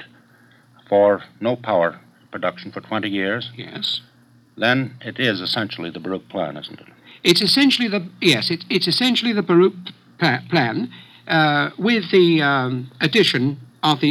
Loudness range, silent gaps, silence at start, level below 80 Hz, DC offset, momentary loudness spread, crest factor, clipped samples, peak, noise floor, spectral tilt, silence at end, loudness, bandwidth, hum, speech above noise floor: 7 LU; none; 0 s; -70 dBFS; under 0.1%; 13 LU; 18 dB; under 0.1%; -2 dBFS; -53 dBFS; -5 dB/octave; 0 s; -19 LUFS; 15 kHz; none; 33 dB